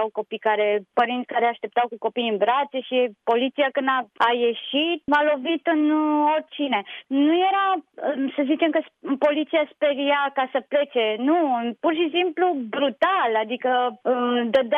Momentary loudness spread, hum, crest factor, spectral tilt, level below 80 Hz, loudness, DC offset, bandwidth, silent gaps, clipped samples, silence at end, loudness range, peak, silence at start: 5 LU; none; 14 dB; -6 dB/octave; -72 dBFS; -22 LUFS; under 0.1%; 5.4 kHz; none; under 0.1%; 0 s; 1 LU; -8 dBFS; 0 s